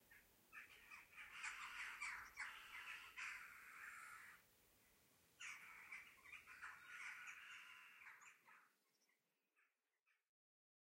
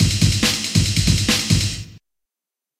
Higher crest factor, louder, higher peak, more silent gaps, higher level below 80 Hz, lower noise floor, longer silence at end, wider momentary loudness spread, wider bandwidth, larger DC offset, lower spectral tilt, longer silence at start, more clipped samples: first, 22 dB vs 16 dB; second, -56 LUFS vs -17 LUFS; second, -38 dBFS vs -2 dBFS; first, 10.02-10.06 s vs none; second, -88 dBFS vs -32 dBFS; about the same, -88 dBFS vs -87 dBFS; about the same, 0.7 s vs 0.8 s; first, 11 LU vs 5 LU; about the same, 16 kHz vs 16 kHz; neither; second, 0.5 dB/octave vs -3.5 dB/octave; about the same, 0 s vs 0 s; neither